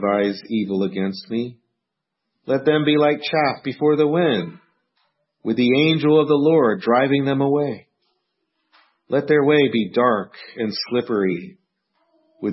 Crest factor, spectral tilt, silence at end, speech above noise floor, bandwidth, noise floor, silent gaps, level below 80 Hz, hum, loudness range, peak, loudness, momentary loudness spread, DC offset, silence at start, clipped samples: 16 dB; -9.5 dB/octave; 0 s; 61 dB; 5.8 kHz; -80 dBFS; none; -68 dBFS; none; 3 LU; -4 dBFS; -19 LUFS; 11 LU; under 0.1%; 0 s; under 0.1%